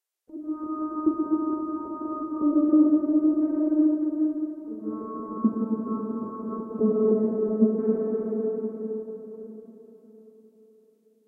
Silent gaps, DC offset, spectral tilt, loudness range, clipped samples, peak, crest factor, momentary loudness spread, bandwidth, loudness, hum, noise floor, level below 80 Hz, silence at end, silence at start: none; under 0.1%; -13.5 dB/octave; 5 LU; under 0.1%; -8 dBFS; 18 dB; 13 LU; 1.8 kHz; -26 LUFS; none; -61 dBFS; -68 dBFS; 1 s; 0.3 s